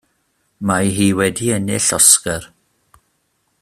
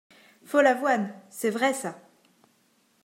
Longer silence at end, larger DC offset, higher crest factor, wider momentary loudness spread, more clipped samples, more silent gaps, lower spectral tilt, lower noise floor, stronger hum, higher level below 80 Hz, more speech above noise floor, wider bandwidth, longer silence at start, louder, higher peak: about the same, 1.15 s vs 1.05 s; neither; about the same, 18 dB vs 20 dB; about the same, 15 LU vs 13 LU; neither; neither; about the same, -3 dB/octave vs -4 dB/octave; about the same, -66 dBFS vs -66 dBFS; neither; first, -50 dBFS vs -88 dBFS; first, 50 dB vs 41 dB; about the same, 16 kHz vs 16 kHz; about the same, 0.6 s vs 0.5 s; first, -14 LUFS vs -25 LUFS; first, 0 dBFS vs -8 dBFS